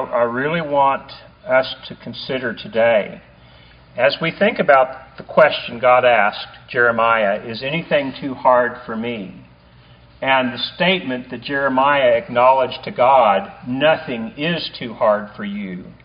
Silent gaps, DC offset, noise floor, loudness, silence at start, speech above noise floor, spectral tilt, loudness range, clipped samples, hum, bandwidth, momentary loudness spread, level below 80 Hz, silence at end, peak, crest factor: none; under 0.1%; -47 dBFS; -17 LUFS; 0 s; 29 dB; -2.5 dB/octave; 5 LU; under 0.1%; none; 5.2 kHz; 13 LU; -54 dBFS; 0.15 s; 0 dBFS; 18 dB